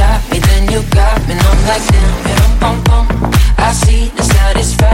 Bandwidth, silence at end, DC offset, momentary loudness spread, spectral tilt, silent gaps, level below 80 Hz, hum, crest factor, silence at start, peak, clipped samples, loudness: 16.5 kHz; 0 s; under 0.1%; 2 LU; -5 dB/octave; none; -10 dBFS; none; 8 dB; 0 s; 0 dBFS; under 0.1%; -11 LUFS